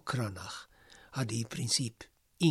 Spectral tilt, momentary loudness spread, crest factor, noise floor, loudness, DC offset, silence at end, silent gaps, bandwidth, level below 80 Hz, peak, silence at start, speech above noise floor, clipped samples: -4 dB/octave; 24 LU; 20 dB; -58 dBFS; -34 LUFS; under 0.1%; 0 s; none; 14.5 kHz; -66 dBFS; -14 dBFS; 0.05 s; 24 dB; under 0.1%